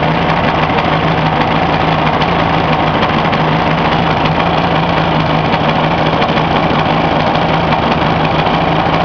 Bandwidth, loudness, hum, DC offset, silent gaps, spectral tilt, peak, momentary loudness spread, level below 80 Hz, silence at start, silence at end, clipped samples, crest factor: 5.4 kHz; -12 LUFS; none; 0.4%; none; -7 dB/octave; 0 dBFS; 0 LU; -30 dBFS; 0 s; 0 s; under 0.1%; 12 dB